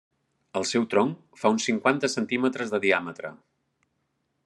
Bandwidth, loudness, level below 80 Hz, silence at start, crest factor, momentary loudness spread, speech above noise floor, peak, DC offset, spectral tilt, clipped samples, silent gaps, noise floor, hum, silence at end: 11.5 kHz; -25 LUFS; -76 dBFS; 0.55 s; 22 dB; 11 LU; 50 dB; -6 dBFS; under 0.1%; -4 dB/octave; under 0.1%; none; -75 dBFS; none; 1.1 s